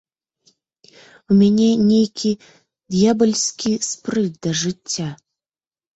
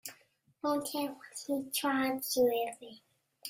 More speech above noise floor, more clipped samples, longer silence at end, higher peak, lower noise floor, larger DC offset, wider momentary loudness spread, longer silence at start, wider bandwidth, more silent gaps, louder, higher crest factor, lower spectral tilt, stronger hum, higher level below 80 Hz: first, over 72 dB vs 35 dB; neither; first, 0.8 s vs 0 s; first, -4 dBFS vs -18 dBFS; first, under -90 dBFS vs -68 dBFS; neither; second, 10 LU vs 16 LU; first, 1.3 s vs 0.05 s; second, 8.2 kHz vs 16 kHz; neither; first, -18 LUFS vs -33 LUFS; about the same, 16 dB vs 16 dB; first, -5 dB/octave vs -2.5 dB/octave; neither; first, -58 dBFS vs -76 dBFS